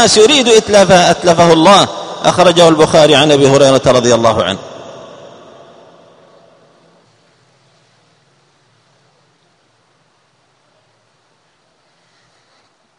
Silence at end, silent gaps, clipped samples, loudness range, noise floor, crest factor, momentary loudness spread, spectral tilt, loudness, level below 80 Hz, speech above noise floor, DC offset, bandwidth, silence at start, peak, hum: 8 s; none; 0.5%; 11 LU; -56 dBFS; 12 dB; 10 LU; -4 dB/octave; -8 LUFS; -46 dBFS; 48 dB; under 0.1%; 13 kHz; 0 s; 0 dBFS; none